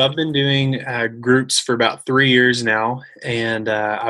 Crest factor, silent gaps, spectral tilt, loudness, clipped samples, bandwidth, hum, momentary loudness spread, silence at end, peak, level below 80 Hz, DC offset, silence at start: 16 dB; none; -4 dB/octave; -17 LUFS; under 0.1%; 12.5 kHz; none; 8 LU; 0 s; -2 dBFS; -60 dBFS; under 0.1%; 0 s